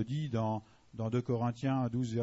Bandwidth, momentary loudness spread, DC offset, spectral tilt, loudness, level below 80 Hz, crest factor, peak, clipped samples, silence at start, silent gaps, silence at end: 7.6 kHz; 8 LU; under 0.1%; -8 dB/octave; -35 LUFS; -64 dBFS; 14 dB; -20 dBFS; under 0.1%; 0 s; none; 0 s